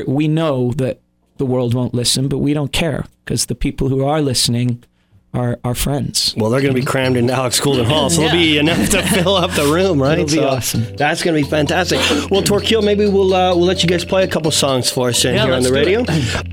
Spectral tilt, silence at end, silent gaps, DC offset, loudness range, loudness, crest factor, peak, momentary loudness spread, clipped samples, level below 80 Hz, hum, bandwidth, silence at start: -4.5 dB/octave; 0 s; none; under 0.1%; 4 LU; -15 LUFS; 14 dB; 0 dBFS; 6 LU; under 0.1%; -36 dBFS; none; 19.5 kHz; 0 s